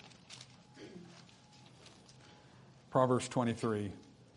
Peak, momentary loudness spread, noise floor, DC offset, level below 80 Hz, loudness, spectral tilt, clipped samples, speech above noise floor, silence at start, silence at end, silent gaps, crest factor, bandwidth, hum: -16 dBFS; 27 LU; -60 dBFS; under 0.1%; -74 dBFS; -34 LUFS; -6 dB/octave; under 0.1%; 27 dB; 0.05 s; 0.35 s; none; 24 dB; 11 kHz; none